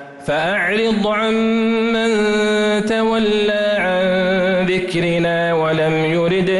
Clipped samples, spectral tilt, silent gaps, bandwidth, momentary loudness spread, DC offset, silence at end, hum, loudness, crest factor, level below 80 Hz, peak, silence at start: under 0.1%; -5.5 dB/octave; none; 11.5 kHz; 1 LU; under 0.1%; 0 s; none; -16 LUFS; 8 dB; -46 dBFS; -8 dBFS; 0 s